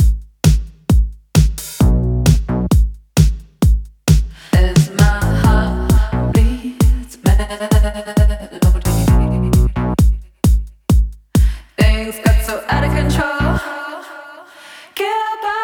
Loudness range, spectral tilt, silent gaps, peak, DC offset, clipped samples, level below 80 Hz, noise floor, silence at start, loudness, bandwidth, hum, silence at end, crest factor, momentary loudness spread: 2 LU; -6 dB/octave; none; 0 dBFS; under 0.1%; under 0.1%; -16 dBFS; -39 dBFS; 0 s; -16 LUFS; 18 kHz; none; 0 s; 14 dB; 5 LU